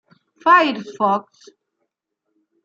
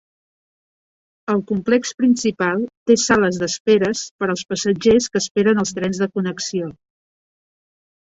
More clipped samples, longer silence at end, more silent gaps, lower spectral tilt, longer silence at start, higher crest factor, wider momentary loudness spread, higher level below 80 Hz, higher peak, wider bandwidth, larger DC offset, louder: neither; first, 1.45 s vs 1.3 s; second, none vs 2.77-2.86 s, 3.60-3.65 s, 4.11-4.19 s, 5.31-5.35 s; about the same, -5 dB/octave vs -4.5 dB/octave; second, 0.45 s vs 1.3 s; about the same, 20 dB vs 18 dB; about the same, 9 LU vs 8 LU; second, -80 dBFS vs -54 dBFS; about the same, -2 dBFS vs -2 dBFS; about the same, 7.6 kHz vs 8.2 kHz; neither; about the same, -17 LUFS vs -19 LUFS